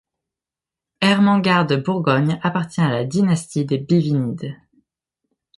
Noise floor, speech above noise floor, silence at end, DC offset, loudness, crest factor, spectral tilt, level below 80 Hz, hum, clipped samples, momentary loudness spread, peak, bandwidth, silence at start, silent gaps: -88 dBFS; 70 dB; 1 s; under 0.1%; -19 LUFS; 16 dB; -6.5 dB/octave; -60 dBFS; none; under 0.1%; 7 LU; -4 dBFS; 11.5 kHz; 1 s; none